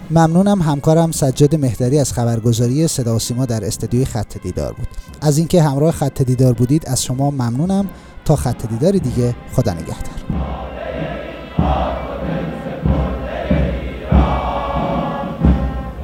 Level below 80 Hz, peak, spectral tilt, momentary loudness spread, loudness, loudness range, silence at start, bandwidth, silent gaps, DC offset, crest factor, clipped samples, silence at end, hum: -26 dBFS; 0 dBFS; -6.5 dB/octave; 11 LU; -17 LUFS; 6 LU; 0 s; 18 kHz; none; under 0.1%; 16 dB; under 0.1%; 0 s; none